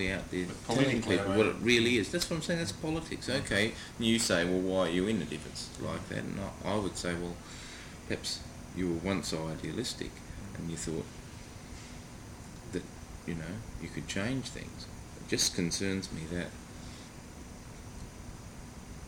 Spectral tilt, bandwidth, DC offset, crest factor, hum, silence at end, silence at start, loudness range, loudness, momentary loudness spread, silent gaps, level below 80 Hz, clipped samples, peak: -4 dB/octave; 18 kHz; under 0.1%; 24 dB; none; 0 s; 0 s; 11 LU; -33 LUFS; 19 LU; none; -52 dBFS; under 0.1%; -10 dBFS